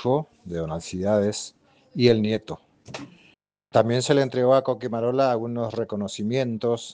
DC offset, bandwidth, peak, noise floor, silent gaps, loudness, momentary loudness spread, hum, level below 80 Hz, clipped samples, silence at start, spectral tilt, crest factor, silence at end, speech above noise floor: under 0.1%; 9.8 kHz; -4 dBFS; -60 dBFS; none; -24 LUFS; 19 LU; none; -58 dBFS; under 0.1%; 0 s; -6 dB/octave; 20 dB; 0 s; 37 dB